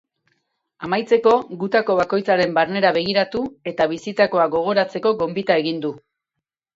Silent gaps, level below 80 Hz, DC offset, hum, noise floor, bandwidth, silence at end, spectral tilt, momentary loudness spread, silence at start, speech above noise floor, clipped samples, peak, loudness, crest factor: none; -60 dBFS; under 0.1%; none; -83 dBFS; 7.8 kHz; 0.8 s; -6 dB/octave; 7 LU; 0.8 s; 64 dB; under 0.1%; -2 dBFS; -19 LUFS; 18 dB